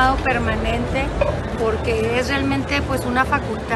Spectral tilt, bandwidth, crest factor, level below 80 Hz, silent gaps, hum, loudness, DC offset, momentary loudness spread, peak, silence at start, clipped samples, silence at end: -6 dB/octave; 12.5 kHz; 16 dB; -30 dBFS; none; none; -20 LUFS; under 0.1%; 3 LU; -4 dBFS; 0 s; under 0.1%; 0 s